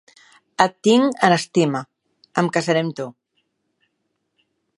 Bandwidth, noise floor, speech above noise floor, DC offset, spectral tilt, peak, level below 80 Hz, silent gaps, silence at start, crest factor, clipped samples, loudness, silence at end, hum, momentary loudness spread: 11.5 kHz; -73 dBFS; 55 dB; under 0.1%; -5 dB/octave; 0 dBFS; -64 dBFS; none; 0.6 s; 22 dB; under 0.1%; -19 LUFS; 1.65 s; none; 14 LU